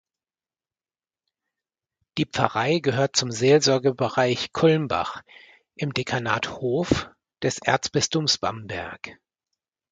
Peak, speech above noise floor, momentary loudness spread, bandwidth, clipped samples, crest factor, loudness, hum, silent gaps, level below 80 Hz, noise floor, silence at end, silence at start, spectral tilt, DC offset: -2 dBFS; over 67 dB; 13 LU; 9.4 kHz; under 0.1%; 24 dB; -23 LUFS; none; none; -54 dBFS; under -90 dBFS; 0.8 s; 2.15 s; -4 dB/octave; under 0.1%